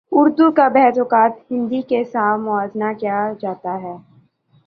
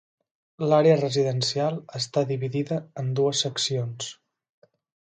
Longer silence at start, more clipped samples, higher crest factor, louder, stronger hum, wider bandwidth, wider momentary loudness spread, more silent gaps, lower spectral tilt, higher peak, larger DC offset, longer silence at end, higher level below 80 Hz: second, 0.1 s vs 0.6 s; neither; about the same, 16 dB vs 18 dB; first, -17 LUFS vs -25 LUFS; neither; second, 5.2 kHz vs 9.4 kHz; about the same, 13 LU vs 11 LU; neither; first, -8.5 dB/octave vs -5 dB/octave; first, -2 dBFS vs -8 dBFS; neither; second, 0.65 s vs 0.95 s; about the same, -66 dBFS vs -70 dBFS